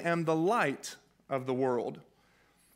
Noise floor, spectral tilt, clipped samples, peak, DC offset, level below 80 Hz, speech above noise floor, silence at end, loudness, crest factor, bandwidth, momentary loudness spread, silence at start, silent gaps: -67 dBFS; -5.5 dB/octave; under 0.1%; -14 dBFS; under 0.1%; -78 dBFS; 36 dB; 0.75 s; -32 LUFS; 20 dB; 16 kHz; 16 LU; 0 s; none